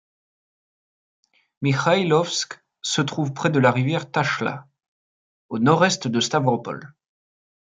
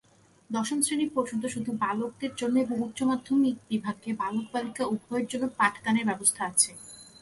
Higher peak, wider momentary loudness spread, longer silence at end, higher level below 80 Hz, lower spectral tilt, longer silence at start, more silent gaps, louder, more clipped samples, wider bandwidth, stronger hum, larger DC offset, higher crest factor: first, -2 dBFS vs -8 dBFS; first, 13 LU vs 8 LU; first, 0.75 s vs 0.05 s; about the same, -66 dBFS vs -68 dBFS; first, -5 dB/octave vs -3 dB/octave; first, 1.6 s vs 0.5 s; first, 4.88-5.49 s vs none; first, -21 LUFS vs -28 LUFS; neither; second, 9.4 kHz vs 12 kHz; neither; neither; about the same, 20 dB vs 22 dB